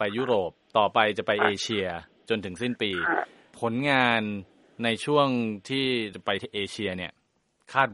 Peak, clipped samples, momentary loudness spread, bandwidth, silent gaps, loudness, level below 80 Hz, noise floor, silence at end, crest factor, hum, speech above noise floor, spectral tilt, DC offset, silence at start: -6 dBFS; under 0.1%; 10 LU; 11.5 kHz; none; -26 LUFS; -66 dBFS; -71 dBFS; 0 s; 22 dB; none; 44 dB; -4.5 dB/octave; under 0.1%; 0 s